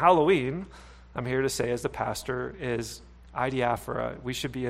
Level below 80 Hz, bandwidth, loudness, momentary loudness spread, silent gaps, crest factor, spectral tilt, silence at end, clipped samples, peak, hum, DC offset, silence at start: -50 dBFS; 16 kHz; -29 LUFS; 15 LU; none; 22 dB; -5 dB/octave; 0 s; under 0.1%; -6 dBFS; none; under 0.1%; 0 s